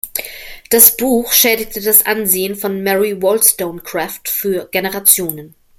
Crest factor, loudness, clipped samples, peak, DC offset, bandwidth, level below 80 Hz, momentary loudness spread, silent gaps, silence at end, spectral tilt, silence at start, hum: 16 dB; -12 LUFS; 0.4%; 0 dBFS; under 0.1%; over 20 kHz; -48 dBFS; 15 LU; none; 0.3 s; -2 dB/octave; 0.05 s; none